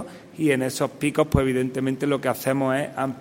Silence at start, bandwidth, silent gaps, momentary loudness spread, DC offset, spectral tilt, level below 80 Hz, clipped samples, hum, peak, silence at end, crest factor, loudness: 0 s; 16.5 kHz; none; 5 LU; under 0.1%; -6 dB/octave; -42 dBFS; under 0.1%; none; -2 dBFS; 0 s; 22 dB; -24 LUFS